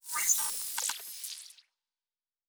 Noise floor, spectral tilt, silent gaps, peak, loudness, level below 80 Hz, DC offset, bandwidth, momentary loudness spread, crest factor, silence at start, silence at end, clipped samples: under -90 dBFS; 4 dB/octave; none; -12 dBFS; -31 LUFS; -82 dBFS; under 0.1%; over 20 kHz; 17 LU; 24 dB; 0.05 s; 0.95 s; under 0.1%